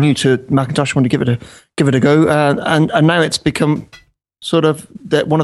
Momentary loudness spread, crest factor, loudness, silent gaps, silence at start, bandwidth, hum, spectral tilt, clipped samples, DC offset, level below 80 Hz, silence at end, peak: 8 LU; 14 dB; -14 LUFS; none; 0 s; 12.5 kHz; none; -6 dB/octave; under 0.1%; under 0.1%; -48 dBFS; 0 s; 0 dBFS